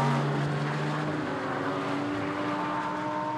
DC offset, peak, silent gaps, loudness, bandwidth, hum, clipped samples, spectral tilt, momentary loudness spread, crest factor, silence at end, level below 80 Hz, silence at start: under 0.1%; -14 dBFS; none; -30 LUFS; 11.5 kHz; none; under 0.1%; -6.5 dB/octave; 3 LU; 14 dB; 0 s; -64 dBFS; 0 s